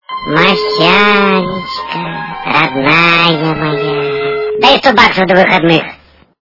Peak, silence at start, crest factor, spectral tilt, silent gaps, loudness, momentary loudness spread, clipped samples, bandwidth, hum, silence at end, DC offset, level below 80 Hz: 0 dBFS; 0.1 s; 10 dB; -5.5 dB/octave; none; -10 LUFS; 12 LU; 1%; 6 kHz; none; 0.45 s; under 0.1%; -44 dBFS